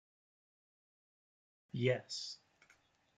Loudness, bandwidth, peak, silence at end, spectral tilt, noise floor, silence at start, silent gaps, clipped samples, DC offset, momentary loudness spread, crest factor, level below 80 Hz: -39 LUFS; 9.4 kHz; -20 dBFS; 0.85 s; -5 dB/octave; -72 dBFS; 1.75 s; none; under 0.1%; under 0.1%; 13 LU; 26 dB; -84 dBFS